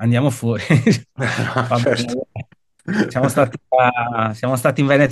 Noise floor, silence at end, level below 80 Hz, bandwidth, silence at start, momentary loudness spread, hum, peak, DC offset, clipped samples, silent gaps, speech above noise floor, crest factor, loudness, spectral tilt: -37 dBFS; 0 s; -56 dBFS; 12.5 kHz; 0 s; 9 LU; none; 0 dBFS; under 0.1%; under 0.1%; none; 19 dB; 16 dB; -18 LUFS; -6.5 dB/octave